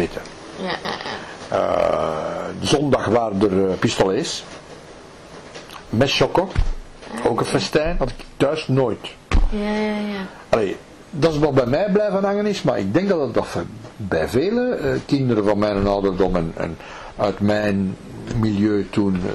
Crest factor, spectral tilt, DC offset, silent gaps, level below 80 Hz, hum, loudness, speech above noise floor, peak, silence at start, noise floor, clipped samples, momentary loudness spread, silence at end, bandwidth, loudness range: 16 dB; -6 dB/octave; 0.1%; none; -32 dBFS; none; -21 LUFS; 21 dB; -4 dBFS; 0 s; -41 dBFS; under 0.1%; 15 LU; 0 s; 13 kHz; 2 LU